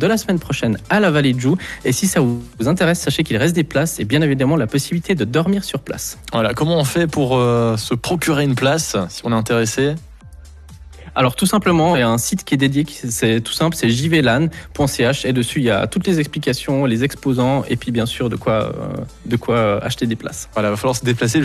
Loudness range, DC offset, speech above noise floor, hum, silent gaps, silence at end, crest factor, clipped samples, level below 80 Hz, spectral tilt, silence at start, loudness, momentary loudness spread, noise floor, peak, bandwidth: 3 LU; under 0.1%; 21 dB; none; none; 0 s; 14 dB; under 0.1%; -42 dBFS; -5 dB/octave; 0 s; -18 LUFS; 6 LU; -39 dBFS; -4 dBFS; 14 kHz